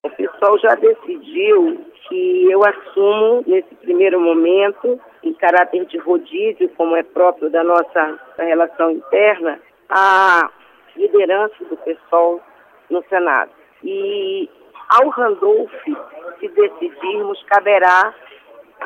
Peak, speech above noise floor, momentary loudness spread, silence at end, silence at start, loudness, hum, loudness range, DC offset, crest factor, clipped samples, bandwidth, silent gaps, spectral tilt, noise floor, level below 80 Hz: -2 dBFS; 28 dB; 13 LU; 0 s; 0.05 s; -15 LUFS; none; 3 LU; under 0.1%; 14 dB; under 0.1%; 7.2 kHz; none; -4.5 dB/octave; -43 dBFS; -70 dBFS